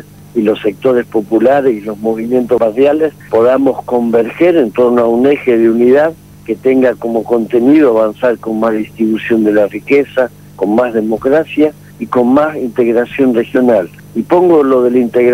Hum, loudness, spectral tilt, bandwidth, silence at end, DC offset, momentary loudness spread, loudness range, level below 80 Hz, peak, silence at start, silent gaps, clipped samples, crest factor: 50 Hz at -40 dBFS; -12 LUFS; -7.5 dB/octave; 15.5 kHz; 0 s; 0.2%; 7 LU; 2 LU; -50 dBFS; 0 dBFS; 0.35 s; none; under 0.1%; 10 dB